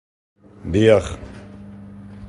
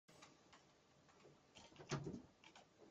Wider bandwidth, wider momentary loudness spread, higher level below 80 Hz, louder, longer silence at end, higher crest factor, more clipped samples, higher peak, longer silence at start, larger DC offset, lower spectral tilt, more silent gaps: first, 11.5 kHz vs 9.4 kHz; first, 24 LU vs 20 LU; first, -40 dBFS vs -80 dBFS; first, -17 LUFS vs -55 LUFS; about the same, 0 s vs 0 s; second, 20 dB vs 26 dB; neither; first, -2 dBFS vs -30 dBFS; first, 0.65 s vs 0.1 s; neither; first, -6.5 dB/octave vs -5 dB/octave; neither